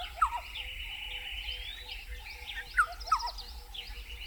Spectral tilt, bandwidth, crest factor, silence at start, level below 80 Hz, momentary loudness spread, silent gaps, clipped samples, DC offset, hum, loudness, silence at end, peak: -1 dB/octave; 19.5 kHz; 20 dB; 0 s; -46 dBFS; 13 LU; none; under 0.1%; under 0.1%; none; -35 LUFS; 0 s; -16 dBFS